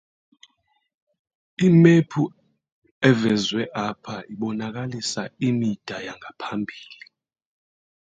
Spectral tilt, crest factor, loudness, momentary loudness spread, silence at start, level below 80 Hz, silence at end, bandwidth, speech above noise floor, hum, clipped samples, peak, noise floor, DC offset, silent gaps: -6 dB/octave; 20 dB; -22 LUFS; 19 LU; 1.6 s; -62 dBFS; 1.1 s; 9.2 kHz; 48 dB; none; under 0.1%; -2 dBFS; -70 dBFS; under 0.1%; 2.72-2.82 s, 2.91-3.01 s